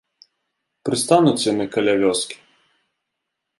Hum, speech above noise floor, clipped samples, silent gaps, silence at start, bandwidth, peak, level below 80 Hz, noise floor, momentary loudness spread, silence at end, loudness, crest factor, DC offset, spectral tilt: none; 61 dB; under 0.1%; none; 0.85 s; 11.5 kHz; -2 dBFS; -62 dBFS; -79 dBFS; 14 LU; 1.25 s; -19 LUFS; 20 dB; under 0.1%; -4.5 dB/octave